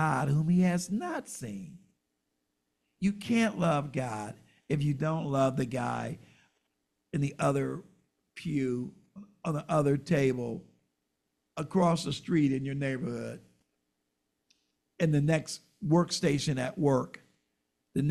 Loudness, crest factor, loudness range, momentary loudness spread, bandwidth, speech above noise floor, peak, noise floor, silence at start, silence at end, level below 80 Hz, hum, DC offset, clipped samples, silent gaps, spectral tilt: -30 LUFS; 18 dB; 4 LU; 14 LU; 13 kHz; 52 dB; -14 dBFS; -81 dBFS; 0 s; 0 s; -62 dBFS; none; under 0.1%; under 0.1%; none; -6.5 dB/octave